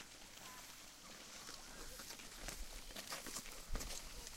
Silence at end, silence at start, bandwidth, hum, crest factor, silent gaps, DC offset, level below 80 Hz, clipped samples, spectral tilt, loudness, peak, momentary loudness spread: 0 s; 0 s; 16.5 kHz; none; 22 dB; none; under 0.1%; -56 dBFS; under 0.1%; -1.5 dB/octave; -50 LUFS; -30 dBFS; 7 LU